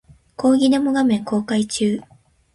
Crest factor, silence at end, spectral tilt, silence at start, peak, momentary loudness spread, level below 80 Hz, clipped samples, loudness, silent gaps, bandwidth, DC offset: 14 dB; 0.55 s; -5 dB/octave; 0.4 s; -6 dBFS; 6 LU; -56 dBFS; under 0.1%; -19 LUFS; none; 11.5 kHz; under 0.1%